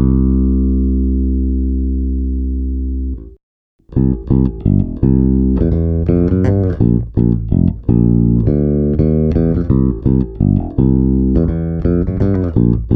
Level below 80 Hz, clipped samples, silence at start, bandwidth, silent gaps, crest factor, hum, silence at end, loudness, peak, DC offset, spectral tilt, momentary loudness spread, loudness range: -20 dBFS; under 0.1%; 0 s; 2.6 kHz; 3.43-3.79 s; 14 dB; none; 0 s; -15 LUFS; 0 dBFS; under 0.1%; -13 dB/octave; 6 LU; 5 LU